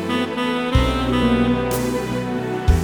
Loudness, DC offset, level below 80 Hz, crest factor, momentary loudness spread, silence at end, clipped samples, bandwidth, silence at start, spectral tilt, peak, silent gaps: -20 LUFS; 0.1%; -26 dBFS; 16 dB; 6 LU; 0 s; under 0.1%; over 20 kHz; 0 s; -6 dB/octave; -2 dBFS; none